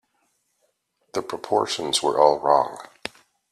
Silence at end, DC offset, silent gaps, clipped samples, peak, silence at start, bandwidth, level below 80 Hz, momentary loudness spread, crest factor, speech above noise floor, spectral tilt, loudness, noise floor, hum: 0.45 s; under 0.1%; none; under 0.1%; -2 dBFS; 1.15 s; 14.5 kHz; -66 dBFS; 18 LU; 22 dB; 50 dB; -2.5 dB/octave; -22 LUFS; -71 dBFS; none